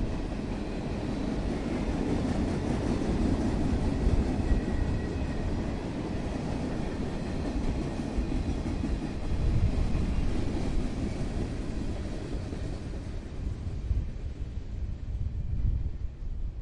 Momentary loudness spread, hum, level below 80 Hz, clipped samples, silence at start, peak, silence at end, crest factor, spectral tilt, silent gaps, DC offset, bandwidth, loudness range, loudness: 9 LU; none; -34 dBFS; under 0.1%; 0 s; -14 dBFS; 0 s; 16 dB; -7.5 dB/octave; none; under 0.1%; 11 kHz; 6 LU; -33 LUFS